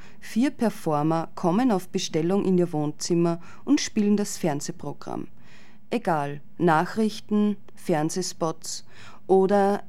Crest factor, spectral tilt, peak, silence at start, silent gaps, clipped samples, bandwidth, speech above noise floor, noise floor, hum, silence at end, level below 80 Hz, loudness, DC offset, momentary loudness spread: 18 dB; -5.5 dB/octave; -6 dBFS; 0.25 s; none; under 0.1%; 15.5 kHz; 27 dB; -51 dBFS; none; 0.1 s; -64 dBFS; -25 LUFS; 2%; 12 LU